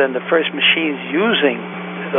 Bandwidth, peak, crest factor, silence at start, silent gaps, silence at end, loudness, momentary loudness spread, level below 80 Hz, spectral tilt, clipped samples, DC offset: 3.8 kHz; -2 dBFS; 16 dB; 0 s; none; 0 s; -16 LUFS; 12 LU; -78 dBFS; -9.5 dB/octave; under 0.1%; under 0.1%